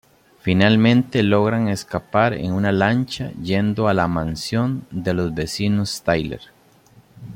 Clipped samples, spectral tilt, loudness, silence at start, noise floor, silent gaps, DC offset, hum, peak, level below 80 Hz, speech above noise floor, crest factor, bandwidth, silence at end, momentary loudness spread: under 0.1%; -6.5 dB/octave; -20 LUFS; 0.45 s; -52 dBFS; none; under 0.1%; none; -2 dBFS; -48 dBFS; 33 dB; 16 dB; 16.5 kHz; 0 s; 10 LU